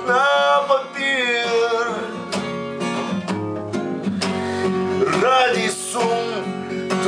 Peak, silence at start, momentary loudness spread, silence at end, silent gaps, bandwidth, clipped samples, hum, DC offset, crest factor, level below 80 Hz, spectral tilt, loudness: -4 dBFS; 0 s; 10 LU; 0 s; none; 10.5 kHz; under 0.1%; none; under 0.1%; 16 dB; -66 dBFS; -4 dB/octave; -20 LUFS